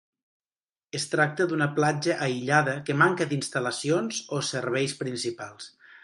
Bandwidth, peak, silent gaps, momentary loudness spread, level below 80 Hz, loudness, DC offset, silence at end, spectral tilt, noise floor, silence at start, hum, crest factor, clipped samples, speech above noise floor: 11.5 kHz; -6 dBFS; none; 10 LU; -72 dBFS; -26 LUFS; under 0.1%; 0.35 s; -4.5 dB/octave; under -90 dBFS; 0.95 s; none; 20 dB; under 0.1%; over 64 dB